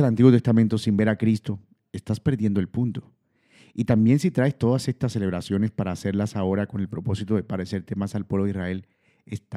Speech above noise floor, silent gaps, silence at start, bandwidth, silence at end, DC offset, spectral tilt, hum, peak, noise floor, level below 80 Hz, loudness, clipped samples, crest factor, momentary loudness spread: 35 dB; none; 0 s; 12.5 kHz; 0 s; under 0.1%; -8 dB/octave; none; -2 dBFS; -58 dBFS; -56 dBFS; -24 LUFS; under 0.1%; 20 dB; 14 LU